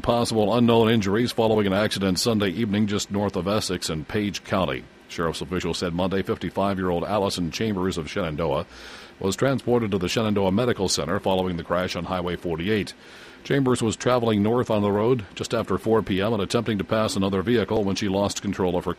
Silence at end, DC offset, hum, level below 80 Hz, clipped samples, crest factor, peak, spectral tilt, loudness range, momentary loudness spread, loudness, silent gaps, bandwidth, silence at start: 0.05 s; under 0.1%; none; -48 dBFS; under 0.1%; 18 dB; -4 dBFS; -5.5 dB/octave; 4 LU; 7 LU; -24 LUFS; none; 15.5 kHz; 0.05 s